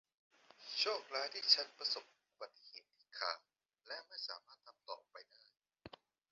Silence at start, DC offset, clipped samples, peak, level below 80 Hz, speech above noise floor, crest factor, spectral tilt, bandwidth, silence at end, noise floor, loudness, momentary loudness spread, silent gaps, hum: 0.6 s; under 0.1%; under 0.1%; -16 dBFS; -88 dBFS; 18 dB; 30 dB; 3 dB/octave; 7.4 kHz; 0.45 s; -60 dBFS; -38 LUFS; 27 LU; none; none